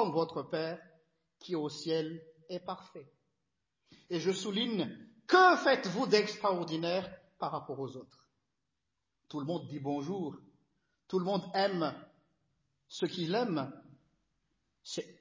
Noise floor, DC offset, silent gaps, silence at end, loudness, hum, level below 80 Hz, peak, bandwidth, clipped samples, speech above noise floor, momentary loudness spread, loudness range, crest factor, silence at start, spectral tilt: -87 dBFS; under 0.1%; none; 0.1 s; -33 LUFS; none; -80 dBFS; -12 dBFS; 7.6 kHz; under 0.1%; 54 dB; 17 LU; 11 LU; 22 dB; 0 s; -5 dB/octave